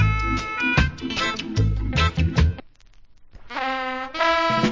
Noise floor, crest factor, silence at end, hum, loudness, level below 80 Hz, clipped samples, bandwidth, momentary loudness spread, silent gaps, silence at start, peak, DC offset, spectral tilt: -48 dBFS; 18 dB; 0 s; none; -22 LUFS; -28 dBFS; under 0.1%; 7.6 kHz; 7 LU; none; 0 s; -6 dBFS; under 0.1%; -5.5 dB/octave